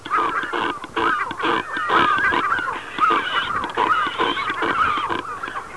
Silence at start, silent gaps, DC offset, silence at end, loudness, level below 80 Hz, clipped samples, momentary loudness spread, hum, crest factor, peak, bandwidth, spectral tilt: 0 s; none; 0.4%; 0 s; -20 LUFS; -52 dBFS; under 0.1%; 7 LU; none; 16 dB; -4 dBFS; 11 kHz; -3.5 dB/octave